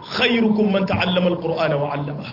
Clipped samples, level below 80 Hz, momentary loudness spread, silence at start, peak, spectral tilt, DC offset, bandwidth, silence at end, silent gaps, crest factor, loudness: under 0.1%; -52 dBFS; 6 LU; 0 s; -6 dBFS; -7 dB/octave; under 0.1%; 5.8 kHz; 0 s; none; 14 dB; -19 LUFS